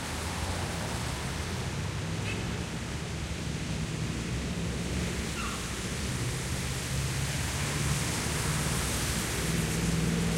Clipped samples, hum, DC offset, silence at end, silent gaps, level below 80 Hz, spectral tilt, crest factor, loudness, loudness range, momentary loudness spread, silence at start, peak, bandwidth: under 0.1%; none; under 0.1%; 0 s; none; -40 dBFS; -4 dB/octave; 16 dB; -32 LUFS; 4 LU; 5 LU; 0 s; -16 dBFS; 16 kHz